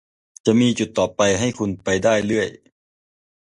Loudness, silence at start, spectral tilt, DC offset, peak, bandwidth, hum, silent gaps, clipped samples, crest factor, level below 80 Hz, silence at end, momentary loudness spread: -20 LUFS; 0.45 s; -4.5 dB/octave; under 0.1%; -2 dBFS; 11 kHz; none; none; under 0.1%; 18 dB; -50 dBFS; 0.9 s; 7 LU